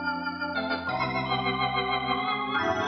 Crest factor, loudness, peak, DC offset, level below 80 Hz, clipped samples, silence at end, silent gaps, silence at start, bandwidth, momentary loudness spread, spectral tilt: 14 dB; -28 LUFS; -14 dBFS; under 0.1%; -54 dBFS; under 0.1%; 0 s; none; 0 s; 6.4 kHz; 4 LU; -5.5 dB/octave